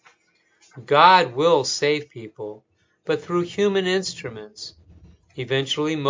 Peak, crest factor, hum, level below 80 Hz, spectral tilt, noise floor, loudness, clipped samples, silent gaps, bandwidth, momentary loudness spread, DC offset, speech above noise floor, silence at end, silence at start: 0 dBFS; 22 dB; none; -62 dBFS; -4 dB/octave; -64 dBFS; -20 LUFS; under 0.1%; none; 7.6 kHz; 22 LU; under 0.1%; 43 dB; 0 s; 0.75 s